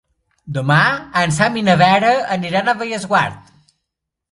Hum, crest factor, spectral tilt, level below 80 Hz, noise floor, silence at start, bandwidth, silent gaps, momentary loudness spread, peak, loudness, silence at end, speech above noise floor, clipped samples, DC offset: none; 18 dB; -5 dB/octave; -52 dBFS; -80 dBFS; 0.45 s; 11.5 kHz; none; 9 LU; 0 dBFS; -15 LUFS; 0.95 s; 64 dB; under 0.1%; under 0.1%